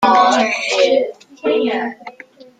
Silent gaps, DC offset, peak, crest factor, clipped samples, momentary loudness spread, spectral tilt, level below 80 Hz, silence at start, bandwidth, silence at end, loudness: none; under 0.1%; 0 dBFS; 16 dB; under 0.1%; 15 LU; -2.5 dB/octave; -62 dBFS; 0 s; 9.4 kHz; 0.5 s; -16 LUFS